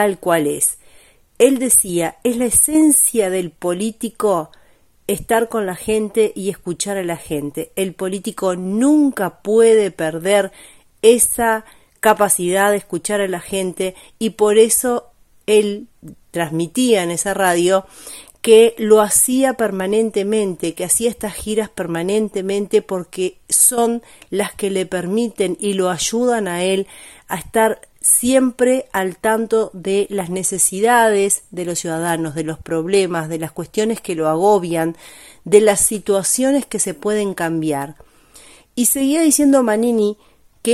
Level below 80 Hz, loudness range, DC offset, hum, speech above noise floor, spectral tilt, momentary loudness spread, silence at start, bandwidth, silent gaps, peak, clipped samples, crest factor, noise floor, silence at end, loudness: -50 dBFS; 5 LU; under 0.1%; none; 34 dB; -3.5 dB/octave; 12 LU; 0 s; 16 kHz; none; 0 dBFS; under 0.1%; 18 dB; -51 dBFS; 0 s; -17 LUFS